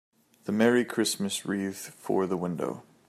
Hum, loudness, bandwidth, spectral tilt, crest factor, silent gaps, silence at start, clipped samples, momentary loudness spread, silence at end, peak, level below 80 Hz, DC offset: none; -28 LUFS; 15.5 kHz; -4.5 dB/octave; 20 dB; none; 0.45 s; under 0.1%; 12 LU; 0.3 s; -8 dBFS; -74 dBFS; under 0.1%